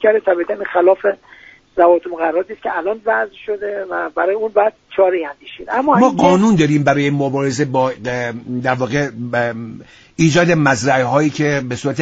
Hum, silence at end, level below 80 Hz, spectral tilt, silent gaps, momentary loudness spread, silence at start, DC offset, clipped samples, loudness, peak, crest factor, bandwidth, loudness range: none; 0 s; -52 dBFS; -6 dB/octave; none; 10 LU; 0 s; under 0.1%; under 0.1%; -16 LUFS; 0 dBFS; 16 dB; 9 kHz; 4 LU